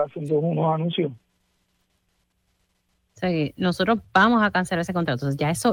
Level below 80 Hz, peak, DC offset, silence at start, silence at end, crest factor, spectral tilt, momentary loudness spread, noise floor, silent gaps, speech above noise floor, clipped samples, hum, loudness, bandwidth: -56 dBFS; -4 dBFS; under 0.1%; 0 s; 0 s; 20 dB; -6 dB/octave; 8 LU; -70 dBFS; none; 48 dB; under 0.1%; none; -23 LUFS; 16.5 kHz